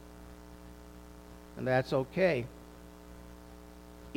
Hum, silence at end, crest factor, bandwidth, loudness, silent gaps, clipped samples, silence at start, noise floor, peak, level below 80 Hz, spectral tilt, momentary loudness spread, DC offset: 60 Hz at -50 dBFS; 0 s; 22 dB; 17 kHz; -32 LUFS; none; under 0.1%; 0 s; -51 dBFS; -14 dBFS; -56 dBFS; -6.5 dB/octave; 22 LU; under 0.1%